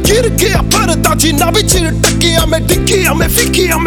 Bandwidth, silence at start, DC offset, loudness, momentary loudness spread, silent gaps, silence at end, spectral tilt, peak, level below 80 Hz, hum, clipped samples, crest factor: over 20 kHz; 0 s; under 0.1%; -10 LUFS; 2 LU; none; 0 s; -3.5 dB/octave; 0 dBFS; -18 dBFS; none; under 0.1%; 10 dB